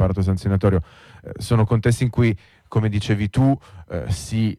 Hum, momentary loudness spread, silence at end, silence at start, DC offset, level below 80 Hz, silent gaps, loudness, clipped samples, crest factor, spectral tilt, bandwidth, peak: none; 13 LU; 0.05 s; 0 s; under 0.1%; -38 dBFS; none; -21 LUFS; under 0.1%; 14 dB; -7 dB/octave; 13 kHz; -6 dBFS